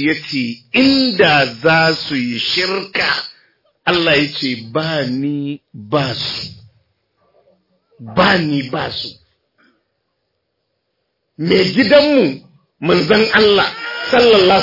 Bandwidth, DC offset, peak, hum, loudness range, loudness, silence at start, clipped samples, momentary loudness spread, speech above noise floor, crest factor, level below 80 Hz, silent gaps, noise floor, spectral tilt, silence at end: 5.8 kHz; under 0.1%; 0 dBFS; none; 8 LU; -14 LUFS; 0 s; under 0.1%; 13 LU; 56 dB; 16 dB; -52 dBFS; none; -70 dBFS; -5.5 dB/octave; 0 s